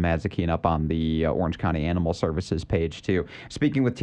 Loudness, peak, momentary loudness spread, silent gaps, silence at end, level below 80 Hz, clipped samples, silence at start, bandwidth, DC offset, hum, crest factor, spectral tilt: -26 LUFS; -6 dBFS; 3 LU; none; 0 s; -38 dBFS; under 0.1%; 0 s; 9.6 kHz; under 0.1%; none; 18 dB; -7.5 dB/octave